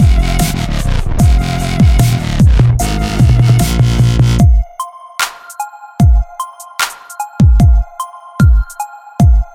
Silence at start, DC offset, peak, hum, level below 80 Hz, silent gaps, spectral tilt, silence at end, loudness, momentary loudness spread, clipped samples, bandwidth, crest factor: 0 s; under 0.1%; 0 dBFS; none; -14 dBFS; none; -6 dB/octave; 0.1 s; -12 LUFS; 16 LU; under 0.1%; 16.5 kHz; 10 dB